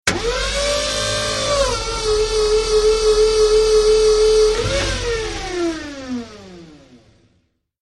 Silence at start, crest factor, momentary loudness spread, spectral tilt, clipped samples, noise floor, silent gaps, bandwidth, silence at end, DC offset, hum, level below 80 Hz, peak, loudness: 0.05 s; 16 dB; 11 LU; -3 dB/octave; under 0.1%; -63 dBFS; none; 11.5 kHz; 1.1 s; under 0.1%; none; -30 dBFS; -2 dBFS; -17 LUFS